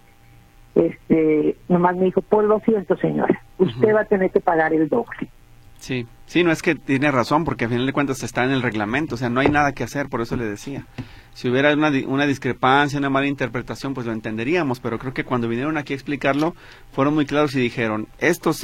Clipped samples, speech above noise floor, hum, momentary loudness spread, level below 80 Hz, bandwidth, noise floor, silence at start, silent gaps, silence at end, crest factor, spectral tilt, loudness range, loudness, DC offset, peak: under 0.1%; 29 dB; none; 10 LU; -46 dBFS; 16 kHz; -49 dBFS; 0.75 s; none; 0 s; 18 dB; -6 dB/octave; 4 LU; -21 LUFS; under 0.1%; -2 dBFS